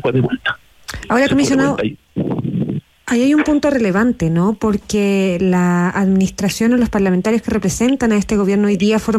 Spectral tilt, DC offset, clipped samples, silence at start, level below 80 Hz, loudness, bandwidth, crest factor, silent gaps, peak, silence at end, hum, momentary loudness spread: -6 dB/octave; under 0.1%; under 0.1%; 0.05 s; -40 dBFS; -16 LUFS; 14.5 kHz; 10 dB; none; -4 dBFS; 0 s; none; 8 LU